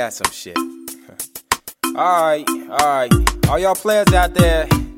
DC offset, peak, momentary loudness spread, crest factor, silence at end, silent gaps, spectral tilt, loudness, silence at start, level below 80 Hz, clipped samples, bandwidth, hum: under 0.1%; 0 dBFS; 15 LU; 16 dB; 0.05 s; none; -5 dB/octave; -17 LUFS; 0 s; -26 dBFS; under 0.1%; 16.5 kHz; none